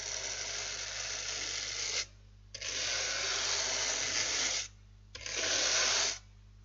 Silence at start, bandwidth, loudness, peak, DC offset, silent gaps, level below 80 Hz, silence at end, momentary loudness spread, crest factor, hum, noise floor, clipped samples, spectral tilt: 0 s; 12 kHz; -32 LUFS; -18 dBFS; under 0.1%; none; -58 dBFS; 0 s; 13 LU; 18 dB; 50 Hz at -55 dBFS; -55 dBFS; under 0.1%; 1 dB/octave